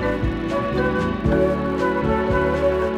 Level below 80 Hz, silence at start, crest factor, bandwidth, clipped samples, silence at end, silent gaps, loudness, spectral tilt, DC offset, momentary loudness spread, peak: -32 dBFS; 0 s; 14 dB; 12.5 kHz; under 0.1%; 0 s; none; -21 LUFS; -8 dB/octave; under 0.1%; 4 LU; -6 dBFS